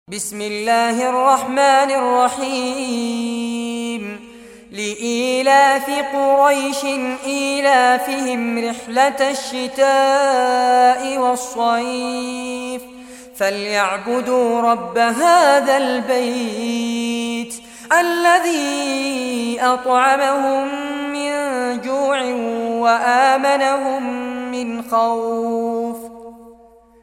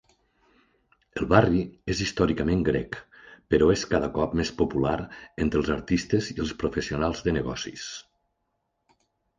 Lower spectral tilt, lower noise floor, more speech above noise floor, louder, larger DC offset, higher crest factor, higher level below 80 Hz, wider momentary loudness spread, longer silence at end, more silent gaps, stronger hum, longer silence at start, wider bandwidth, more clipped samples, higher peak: second, -2.5 dB/octave vs -6 dB/octave; second, -47 dBFS vs -77 dBFS; second, 30 dB vs 52 dB; first, -17 LUFS vs -26 LUFS; neither; second, 16 dB vs 24 dB; second, -60 dBFS vs -42 dBFS; about the same, 11 LU vs 13 LU; second, 0.5 s vs 1.4 s; neither; neither; second, 0.1 s vs 1.15 s; first, 16.5 kHz vs 9.8 kHz; neither; about the same, -2 dBFS vs -2 dBFS